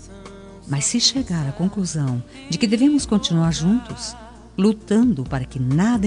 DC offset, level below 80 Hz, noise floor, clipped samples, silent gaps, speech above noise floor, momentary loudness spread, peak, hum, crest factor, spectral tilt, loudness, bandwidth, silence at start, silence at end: under 0.1%; -42 dBFS; -39 dBFS; under 0.1%; none; 20 dB; 15 LU; -2 dBFS; none; 18 dB; -5 dB/octave; -20 LUFS; 10.5 kHz; 0 s; 0 s